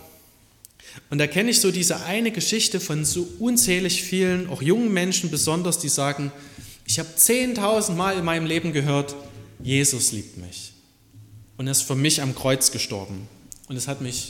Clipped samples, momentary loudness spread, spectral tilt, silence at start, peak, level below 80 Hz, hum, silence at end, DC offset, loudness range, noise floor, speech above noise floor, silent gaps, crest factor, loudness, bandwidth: under 0.1%; 17 LU; -3 dB/octave; 0.05 s; -2 dBFS; -54 dBFS; none; 0 s; under 0.1%; 3 LU; -54 dBFS; 31 dB; none; 22 dB; -21 LUFS; 17.5 kHz